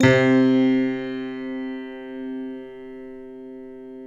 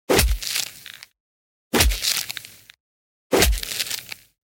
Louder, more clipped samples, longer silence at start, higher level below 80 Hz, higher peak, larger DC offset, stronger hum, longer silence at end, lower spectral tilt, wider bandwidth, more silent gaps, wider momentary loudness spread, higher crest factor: about the same, -22 LUFS vs -22 LUFS; neither; about the same, 0 s vs 0.1 s; second, -58 dBFS vs -30 dBFS; about the same, -4 dBFS vs -2 dBFS; neither; first, 60 Hz at -70 dBFS vs none; second, 0 s vs 0.3 s; first, -7 dB/octave vs -2.5 dB/octave; second, 7.6 kHz vs 17 kHz; second, none vs 1.20-1.71 s, 2.80-3.30 s; about the same, 22 LU vs 20 LU; about the same, 20 dB vs 22 dB